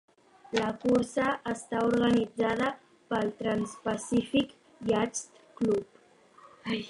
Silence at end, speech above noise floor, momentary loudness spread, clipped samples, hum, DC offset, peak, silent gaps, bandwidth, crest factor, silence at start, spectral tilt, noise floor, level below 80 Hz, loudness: 0 s; 30 dB; 9 LU; under 0.1%; none; under 0.1%; -12 dBFS; none; 11.5 kHz; 18 dB; 0.5 s; -5 dB/octave; -59 dBFS; -60 dBFS; -30 LUFS